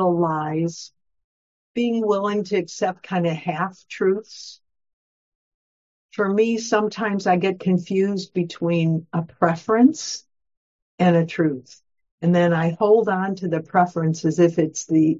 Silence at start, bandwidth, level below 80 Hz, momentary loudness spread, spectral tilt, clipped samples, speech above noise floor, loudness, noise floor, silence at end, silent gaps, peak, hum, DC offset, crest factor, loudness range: 0 s; 7.8 kHz; -68 dBFS; 10 LU; -6.5 dB/octave; under 0.1%; over 70 dB; -21 LUFS; under -90 dBFS; 0 s; 1.24-1.74 s, 4.93-6.09 s, 10.57-10.98 s, 12.11-12.18 s; -2 dBFS; none; under 0.1%; 20 dB; 6 LU